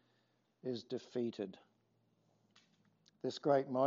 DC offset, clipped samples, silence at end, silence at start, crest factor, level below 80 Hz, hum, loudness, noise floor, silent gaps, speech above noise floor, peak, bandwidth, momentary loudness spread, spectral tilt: under 0.1%; under 0.1%; 0 s; 0.65 s; 22 dB; under -90 dBFS; none; -40 LUFS; -78 dBFS; none; 41 dB; -20 dBFS; 7.4 kHz; 13 LU; -5.5 dB/octave